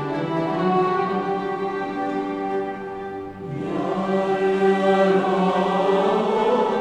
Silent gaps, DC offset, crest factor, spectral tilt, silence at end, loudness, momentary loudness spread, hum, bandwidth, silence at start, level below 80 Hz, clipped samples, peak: none; under 0.1%; 14 dB; -7 dB/octave; 0 s; -22 LUFS; 12 LU; none; 9.4 kHz; 0 s; -58 dBFS; under 0.1%; -8 dBFS